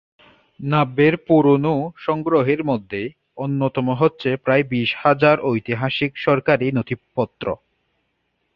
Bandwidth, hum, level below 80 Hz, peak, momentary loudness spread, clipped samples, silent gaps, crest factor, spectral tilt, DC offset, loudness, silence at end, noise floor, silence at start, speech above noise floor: 5.8 kHz; none; -56 dBFS; -2 dBFS; 12 LU; under 0.1%; none; 18 dB; -9.5 dB/octave; under 0.1%; -19 LUFS; 1 s; -71 dBFS; 0.6 s; 52 dB